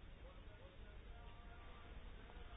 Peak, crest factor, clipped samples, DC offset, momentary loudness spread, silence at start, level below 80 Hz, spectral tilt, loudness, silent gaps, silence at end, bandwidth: -44 dBFS; 12 dB; under 0.1%; under 0.1%; 2 LU; 0 s; -58 dBFS; -4 dB/octave; -60 LUFS; none; 0 s; 3.8 kHz